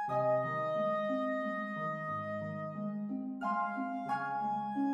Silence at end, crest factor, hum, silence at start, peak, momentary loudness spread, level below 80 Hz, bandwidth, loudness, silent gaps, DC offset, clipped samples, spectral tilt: 0 s; 12 dB; none; 0 s; -22 dBFS; 7 LU; -82 dBFS; 8.8 kHz; -36 LUFS; none; under 0.1%; under 0.1%; -8 dB/octave